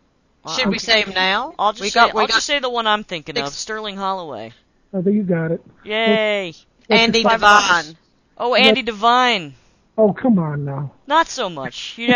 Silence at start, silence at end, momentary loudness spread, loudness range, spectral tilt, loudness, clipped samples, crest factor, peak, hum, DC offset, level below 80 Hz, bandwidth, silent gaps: 0.45 s; 0 s; 15 LU; 6 LU; -4 dB/octave; -17 LUFS; under 0.1%; 18 dB; 0 dBFS; none; under 0.1%; -52 dBFS; 8 kHz; none